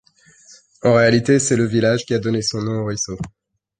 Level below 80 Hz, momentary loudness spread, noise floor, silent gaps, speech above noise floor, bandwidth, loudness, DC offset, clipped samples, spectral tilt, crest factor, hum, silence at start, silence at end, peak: -50 dBFS; 11 LU; -50 dBFS; none; 32 dB; 9.8 kHz; -18 LUFS; under 0.1%; under 0.1%; -5 dB/octave; 16 dB; none; 0.85 s; 0.5 s; -2 dBFS